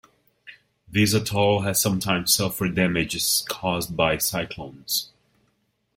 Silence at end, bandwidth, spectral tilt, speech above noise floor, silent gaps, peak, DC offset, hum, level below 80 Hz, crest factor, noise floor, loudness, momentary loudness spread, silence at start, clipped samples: 0.9 s; 16.5 kHz; -3.5 dB/octave; 47 dB; none; -4 dBFS; under 0.1%; none; -52 dBFS; 20 dB; -70 dBFS; -22 LUFS; 7 LU; 0.45 s; under 0.1%